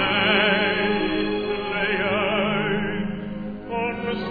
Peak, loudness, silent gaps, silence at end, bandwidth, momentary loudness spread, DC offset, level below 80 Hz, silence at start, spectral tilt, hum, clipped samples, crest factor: -6 dBFS; -22 LUFS; none; 0 s; 5 kHz; 12 LU; under 0.1%; -46 dBFS; 0 s; -8.5 dB/octave; none; under 0.1%; 18 dB